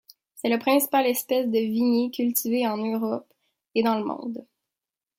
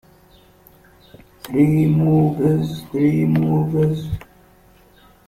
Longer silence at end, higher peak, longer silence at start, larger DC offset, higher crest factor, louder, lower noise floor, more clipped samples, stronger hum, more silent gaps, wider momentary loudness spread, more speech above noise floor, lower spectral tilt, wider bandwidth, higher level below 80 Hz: second, 0.75 s vs 1.1 s; second, -8 dBFS vs -4 dBFS; second, 0.35 s vs 1.45 s; neither; about the same, 18 dB vs 16 dB; second, -24 LUFS vs -18 LUFS; first, -89 dBFS vs -51 dBFS; neither; neither; neither; about the same, 10 LU vs 11 LU; first, 65 dB vs 34 dB; second, -4 dB/octave vs -9 dB/octave; first, 16.5 kHz vs 14.5 kHz; second, -76 dBFS vs -46 dBFS